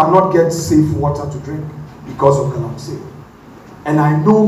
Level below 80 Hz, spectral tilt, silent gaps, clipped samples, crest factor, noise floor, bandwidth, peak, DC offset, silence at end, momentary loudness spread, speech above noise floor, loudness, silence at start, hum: -42 dBFS; -7.5 dB/octave; none; under 0.1%; 14 dB; -38 dBFS; 14 kHz; 0 dBFS; under 0.1%; 0 s; 18 LU; 24 dB; -15 LUFS; 0 s; none